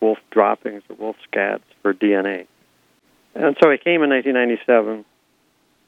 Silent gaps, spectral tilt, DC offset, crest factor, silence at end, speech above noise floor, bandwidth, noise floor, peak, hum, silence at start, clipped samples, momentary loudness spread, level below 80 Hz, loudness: none; -7 dB/octave; under 0.1%; 20 dB; 0.85 s; 44 dB; 7.4 kHz; -62 dBFS; 0 dBFS; none; 0 s; under 0.1%; 15 LU; -74 dBFS; -18 LUFS